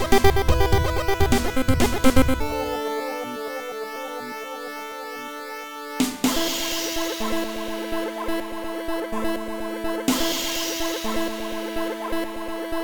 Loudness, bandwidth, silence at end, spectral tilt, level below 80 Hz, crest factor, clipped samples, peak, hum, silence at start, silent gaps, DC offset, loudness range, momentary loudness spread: -25 LUFS; over 20 kHz; 0 s; -4.5 dB/octave; -34 dBFS; 18 dB; under 0.1%; -4 dBFS; none; 0 s; none; 2%; 7 LU; 13 LU